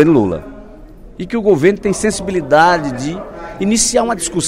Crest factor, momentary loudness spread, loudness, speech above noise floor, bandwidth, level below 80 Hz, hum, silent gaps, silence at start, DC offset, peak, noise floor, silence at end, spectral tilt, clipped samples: 14 dB; 15 LU; -14 LUFS; 22 dB; 16 kHz; -38 dBFS; none; none; 0 s; under 0.1%; 0 dBFS; -36 dBFS; 0 s; -4 dB/octave; under 0.1%